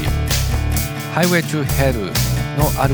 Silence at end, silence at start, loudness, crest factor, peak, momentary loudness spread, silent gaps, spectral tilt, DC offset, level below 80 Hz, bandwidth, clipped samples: 0 s; 0 s; -18 LUFS; 18 dB; 0 dBFS; 4 LU; none; -5 dB/octave; under 0.1%; -24 dBFS; over 20 kHz; under 0.1%